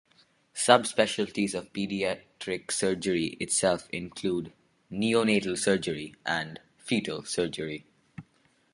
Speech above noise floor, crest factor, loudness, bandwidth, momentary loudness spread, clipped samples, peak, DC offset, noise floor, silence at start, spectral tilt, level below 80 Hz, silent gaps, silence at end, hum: 38 dB; 28 dB; -28 LUFS; 11.5 kHz; 17 LU; under 0.1%; -2 dBFS; under 0.1%; -67 dBFS; 0.55 s; -3.5 dB/octave; -62 dBFS; none; 0.5 s; none